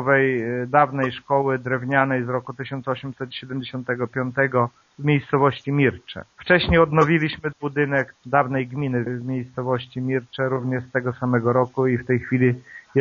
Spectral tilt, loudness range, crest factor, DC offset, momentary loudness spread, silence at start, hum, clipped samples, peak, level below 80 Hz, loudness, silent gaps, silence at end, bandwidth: -5.5 dB/octave; 4 LU; 20 dB; under 0.1%; 10 LU; 0 s; none; under 0.1%; -2 dBFS; -46 dBFS; -22 LUFS; none; 0 s; 7.2 kHz